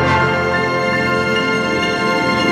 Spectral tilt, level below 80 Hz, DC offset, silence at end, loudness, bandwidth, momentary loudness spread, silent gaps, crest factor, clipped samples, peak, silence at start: -5 dB/octave; -46 dBFS; under 0.1%; 0 s; -16 LUFS; 16 kHz; 2 LU; none; 14 dB; under 0.1%; -2 dBFS; 0 s